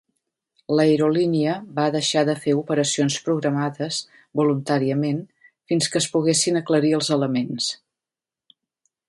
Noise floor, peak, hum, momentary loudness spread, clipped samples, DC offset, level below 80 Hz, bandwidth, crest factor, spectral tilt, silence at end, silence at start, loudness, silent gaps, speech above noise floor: -90 dBFS; -6 dBFS; none; 7 LU; under 0.1%; under 0.1%; -68 dBFS; 11.5 kHz; 18 dB; -4.5 dB/octave; 1.35 s; 0.7 s; -21 LUFS; none; 69 dB